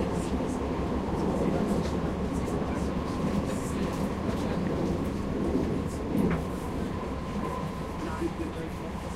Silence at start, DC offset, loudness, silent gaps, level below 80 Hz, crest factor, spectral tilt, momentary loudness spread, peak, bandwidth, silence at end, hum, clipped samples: 0 s; under 0.1%; -31 LUFS; none; -40 dBFS; 14 dB; -7 dB/octave; 6 LU; -14 dBFS; 15.5 kHz; 0 s; none; under 0.1%